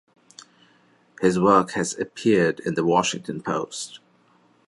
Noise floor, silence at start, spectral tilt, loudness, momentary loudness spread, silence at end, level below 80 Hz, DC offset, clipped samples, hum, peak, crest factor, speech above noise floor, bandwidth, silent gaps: -60 dBFS; 1.2 s; -5 dB/octave; -22 LUFS; 12 LU; 0.7 s; -60 dBFS; under 0.1%; under 0.1%; none; -4 dBFS; 22 dB; 38 dB; 11.5 kHz; none